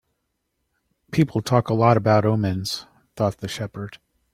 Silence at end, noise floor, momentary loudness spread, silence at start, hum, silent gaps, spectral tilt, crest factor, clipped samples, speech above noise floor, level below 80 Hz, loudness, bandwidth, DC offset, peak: 0.4 s; -75 dBFS; 14 LU; 1.1 s; none; none; -6.5 dB/octave; 20 dB; under 0.1%; 55 dB; -56 dBFS; -22 LUFS; 15 kHz; under 0.1%; -2 dBFS